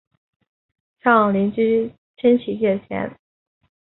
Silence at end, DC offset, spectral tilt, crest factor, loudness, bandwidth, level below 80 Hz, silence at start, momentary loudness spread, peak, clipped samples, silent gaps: 0.8 s; under 0.1%; -11.5 dB/octave; 20 dB; -19 LUFS; 4.1 kHz; -60 dBFS; 1.05 s; 12 LU; -2 dBFS; under 0.1%; 1.98-2.14 s